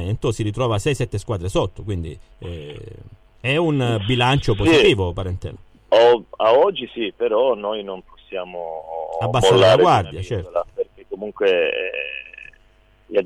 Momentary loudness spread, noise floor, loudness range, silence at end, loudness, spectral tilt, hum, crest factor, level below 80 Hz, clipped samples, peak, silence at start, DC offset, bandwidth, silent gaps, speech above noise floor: 19 LU; -54 dBFS; 7 LU; 0 s; -19 LUFS; -6 dB/octave; none; 16 dB; -40 dBFS; under 0.1%; -4 dBFS; 0 s; under 0.1%; 14 kHz; none; 35 dB